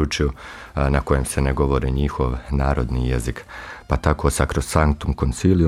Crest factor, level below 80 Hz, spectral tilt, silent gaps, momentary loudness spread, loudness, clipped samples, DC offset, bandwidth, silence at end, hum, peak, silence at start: 18 dB; -26 dBFS; -6 dB/octave; none; 9 LU; -21 LUFS; under 0.1%; under 0.1%; 15.5 kHz; 0 s; none; -2 dBFS; 0 s